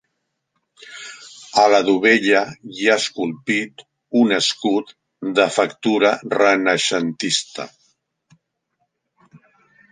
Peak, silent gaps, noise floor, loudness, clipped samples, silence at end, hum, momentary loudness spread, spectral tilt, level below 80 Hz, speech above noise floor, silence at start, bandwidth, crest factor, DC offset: -2 dBFS; none; -74 dBFS; -18 LUFS; under 0.1%; 0.55 s; none; 19 LU; -3 dB/octave; -68 dBFS; 57 dB; 0.9 s; 10 kHz; 18 dB; under 0.1%